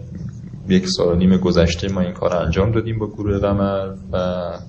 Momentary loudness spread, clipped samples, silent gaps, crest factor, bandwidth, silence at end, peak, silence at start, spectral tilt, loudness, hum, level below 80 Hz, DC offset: 10 LU; under 0.1%; none; 18 dB; 8.6 kHz; 0 s; -2 dBFS; 0 s; -6.5 dB/octave; -19 LUFS; none; -32 dBFS; under 0.1%